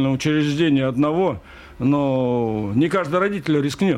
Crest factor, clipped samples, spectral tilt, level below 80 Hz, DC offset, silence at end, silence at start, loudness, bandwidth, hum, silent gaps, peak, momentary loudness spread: 12 dB; under 0.1%; -7 dB/octave; -50 dBFS; under 0.1%; 0 s; 0 s; -20 LUFS; 13 kHz; none; none; -8 dBFS; 4 LU